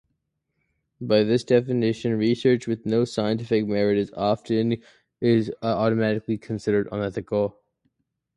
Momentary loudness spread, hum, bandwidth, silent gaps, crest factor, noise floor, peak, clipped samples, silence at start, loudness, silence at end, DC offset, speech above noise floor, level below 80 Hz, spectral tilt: 7 LU; none; 11 kHz; none; 18 dB; -76 dBFS; -6 dBFS; under 0.1%; 1 s; -24 LUFS; 0.85 s; under 0.1%; 54 dB; -58 dBFS; -7 dB/octave